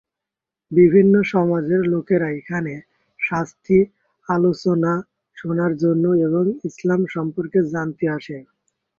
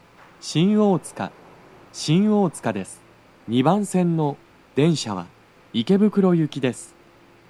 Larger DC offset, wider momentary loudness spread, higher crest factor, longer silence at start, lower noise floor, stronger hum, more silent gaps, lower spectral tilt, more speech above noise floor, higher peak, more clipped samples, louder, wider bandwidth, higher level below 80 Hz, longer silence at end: neither; second, 11 LU vs 15 LU; about the same, 16 dB vs 18 dB; first, 0.7 s vs 0.45 s; first, -86 dBFS vs -52 dBFS; neither; neither; first, -8.5 dB/octave vs -6.5 dB/octave; first, 68 dB vs 32 dB; about the same, -2 dBFS vs -4 dBFS; neither; about the same, -19 LUFS vs -21 LUFS; second, 7.2 kHz vs 12.5 kHz; first, -58 dBFS vs -64 dBFS; about the same, 0.6 s vs 0.65 s